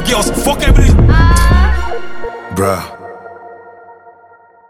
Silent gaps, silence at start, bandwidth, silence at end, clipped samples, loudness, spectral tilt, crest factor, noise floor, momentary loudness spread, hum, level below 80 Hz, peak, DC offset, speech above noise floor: none; 0 s; 17 kHz; 0 s; under 0.1%; -12 LUFS; -5.5 dB/octave; 12 dB; -43 dBFS; 22 LU; none; -14 dBFS; 0 dBFS; under 0.1%; 35 dB